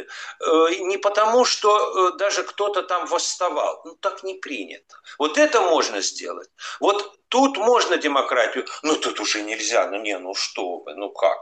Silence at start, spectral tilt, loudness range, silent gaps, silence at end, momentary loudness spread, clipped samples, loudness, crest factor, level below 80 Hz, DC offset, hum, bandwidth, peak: 0 s; 0 dB/octave; 3 LU; none; 0 s; 13 LU; under 0.1%; -21 LUFS; 16 dB; -78 dBFS; under 0.1%; none; 9.4 kHz; -6 dBFS